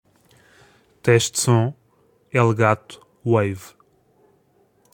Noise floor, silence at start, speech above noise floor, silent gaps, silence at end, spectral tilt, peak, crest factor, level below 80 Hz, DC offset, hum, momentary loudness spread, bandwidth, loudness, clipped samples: -61 dBFS; 1.05 s; 42 dB; none; 1.25 s; -5 dB/octave; -2 dBFS; 22 dB; -62 dBFS; under 0.1%; none; 10 LU; 17 kHz; -20 LUFS; under 0.1%